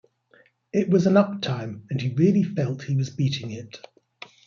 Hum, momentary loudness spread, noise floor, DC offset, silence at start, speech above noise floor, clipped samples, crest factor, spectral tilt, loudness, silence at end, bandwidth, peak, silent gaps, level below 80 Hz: none; 17 LU; -59 dBFS; under 0.1%; 0.75 s; 37 dB; under 0.1%; 20 dB; -7.5 dB/octave; -23 LUFS; 0.7 s; 7.2 kHz; -4 dBFS; none; -64 dBFS